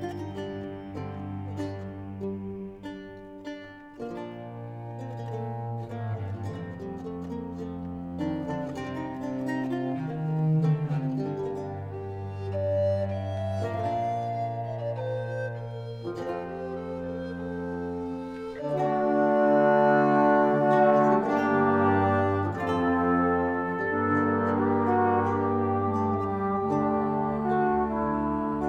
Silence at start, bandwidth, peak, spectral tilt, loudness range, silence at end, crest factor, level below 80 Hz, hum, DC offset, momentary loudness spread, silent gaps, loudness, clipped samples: 0 s; 9 kHz; -10 dBFS; -9 dB/octave; 15 LU; 0 s; 18 dB; -56 dBFS; none; under 0.1%; 15 LU; none; -28 LUFS; under 0.1%